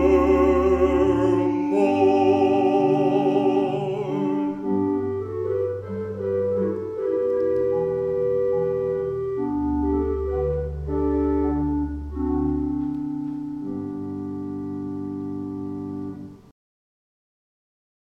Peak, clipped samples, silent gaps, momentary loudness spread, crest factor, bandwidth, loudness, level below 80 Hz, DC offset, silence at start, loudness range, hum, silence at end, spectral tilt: -8 dBFS; under 0.1%; none; 12 LU; 16 dB; 7.8 kHz; -23 LUFS; -38 dBFS; under 0.1%; 0 s; 12 LU; none; 1.65 s; -8.5 dB/octave